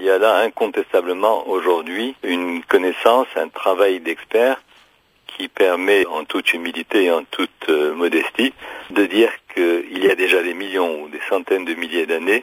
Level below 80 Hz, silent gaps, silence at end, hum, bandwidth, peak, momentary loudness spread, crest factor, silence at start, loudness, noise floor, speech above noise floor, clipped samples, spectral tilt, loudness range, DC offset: -66 dBFS; none; 0 s; none; 16 kHz; 0 dBFS; 8 LU; 18 dB; 0 s; -18 LUFS; -55 dBFS; 37 dB; under 0.1%; -3 dB/octave; 1 LU; under 0.1%